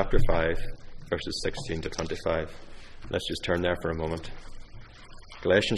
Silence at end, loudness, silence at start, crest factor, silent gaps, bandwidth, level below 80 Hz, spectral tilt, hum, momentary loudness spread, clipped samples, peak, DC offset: 0 s; -30 LUFS; 0 s; 20 dB; none; 11.5 kHz; -34 dBFS; -5 dB/octave; none; 23 LU; under 0.1%; -6 dBFS; under 0.1%